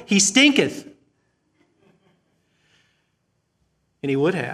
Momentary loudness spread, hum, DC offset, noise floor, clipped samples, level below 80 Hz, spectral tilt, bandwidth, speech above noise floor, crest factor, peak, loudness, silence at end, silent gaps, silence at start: 17 LU; none; under 0.1%; -71 dBFS; under 0.1%; -70 dBFS; -3 dB/octave; 14 kHz; 52 dB; 22 dB; -2 dBFS; -18 LUFS; 0 s; none; 0 s